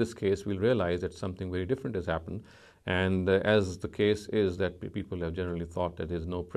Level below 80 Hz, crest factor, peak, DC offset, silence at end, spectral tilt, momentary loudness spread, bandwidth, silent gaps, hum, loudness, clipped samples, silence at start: -46 dBFS; 18 dB; -12 dBFS; under 0.1%; 0 s; -6.5 dB/octave; 10 LU; 12.5 kHz; none; none; -31 LUFS; under 0.1%; 0 s